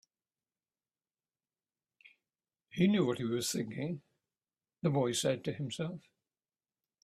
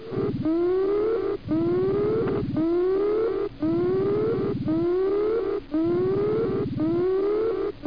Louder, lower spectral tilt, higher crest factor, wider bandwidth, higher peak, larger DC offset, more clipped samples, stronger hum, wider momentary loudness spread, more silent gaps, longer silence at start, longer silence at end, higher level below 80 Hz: second, -34 LUFS vs -24 LUFS; second, -5 dB/octave vs -10.5 dB/octave; first, 22 dB vs 8 dB; first, 15 kHz vs 5.2 kHz; about the same, -16 dBFS vs -14 dBFS; second, under 0.1% vs 0.4%; neither; neither; first, 12 LU vs 3 LU; neither; first, 2.75 s vs 0 s; first, 1.05 s vs 0 s; second, -74 dBFS vs -48 dBFS